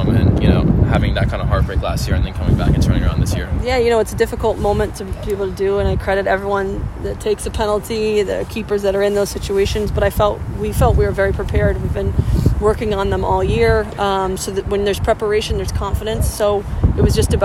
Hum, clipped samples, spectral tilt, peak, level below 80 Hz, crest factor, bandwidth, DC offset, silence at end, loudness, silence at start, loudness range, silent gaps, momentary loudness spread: none; under 0.1%; -6.5 dB/octave; 0 dBFS; -24 dBFS; 16 dB; 16 kHz; under 0.1%; 0 s; -17 LUFS; 0 s; 2 LU; none; 6 LU